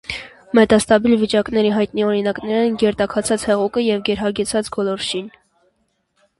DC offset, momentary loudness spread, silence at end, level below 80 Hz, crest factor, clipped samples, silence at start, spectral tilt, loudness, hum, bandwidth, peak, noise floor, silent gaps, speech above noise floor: under 0.1%; 9 LU; 1.1 s; -48 dBFS; 18 dB; under 0.1%; 0.1 s; -4.5 dB/octave; -18 LUFS; none; 11.5 kHz; 0 dBFS; -67 dBFS; none; 49 dB